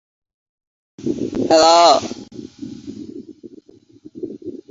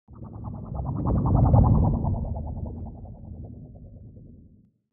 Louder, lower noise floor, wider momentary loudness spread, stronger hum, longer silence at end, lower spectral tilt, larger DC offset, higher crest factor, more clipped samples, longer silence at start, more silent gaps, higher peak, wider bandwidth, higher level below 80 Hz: first, -14 LUFS vs -24 LUFS; second, -47 dBFS vs -56 dBFS; about the same, 24 LU vs 25 LU; neither; second, 0.15 s vs 0.6 s; second, -3 dB/octave vs -15 dB/octave; neither; about the same, 20 dB vs 18 dB; neither; first, 1 s vs 0.1 s; neither; first, 0 dBFS vs -6 dBFS; first, 8 kHz vs 1.6 kHz; second, -56 dBFS vs -32 dBFS